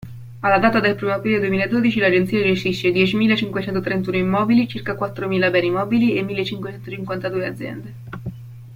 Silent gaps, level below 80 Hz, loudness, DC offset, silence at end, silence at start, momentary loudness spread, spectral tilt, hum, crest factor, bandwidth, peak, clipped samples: none; -52 dBFS; -19 LUFS; under 0.1%; 0 s; 0 s; 15 LU; -7 dB/octave; none; 18 dB; 16 kHz; -2 dBFS; under 0.1%